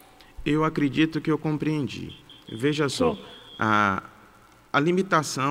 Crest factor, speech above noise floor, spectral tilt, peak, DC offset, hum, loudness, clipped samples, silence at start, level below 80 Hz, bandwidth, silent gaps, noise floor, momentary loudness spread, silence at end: 18 dB; 29 dB; -5.5 dB/octave; -8 dBFS; under 0.1%; none; -25 LUFS; under 0.1%; 0.4 s; -52 dBFS; 16 kHz; none; -54 dBFS; 15 LU; 0 s